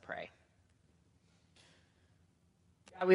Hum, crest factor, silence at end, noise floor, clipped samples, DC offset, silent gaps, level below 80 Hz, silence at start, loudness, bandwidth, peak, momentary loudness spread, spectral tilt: none; 26 dB; 0 s; -71 dBFS; under 0.1%; under 0.1%; none; -80 dBFS; 0.1 s; -43 LUFS; 11 kHz; -12 dBFS; 23 LU; -7 dB/octave